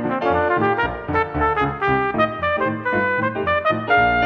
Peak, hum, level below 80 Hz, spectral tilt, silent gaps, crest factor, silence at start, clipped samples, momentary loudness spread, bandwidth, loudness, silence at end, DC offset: -4 dBFS; none; -40 dBFS; -8 dB/octave; none; 16 dB; 0 s; under 0.1%; 4 LU; 6.8 kHz; -19 LUFS; 0 s; under 0.1%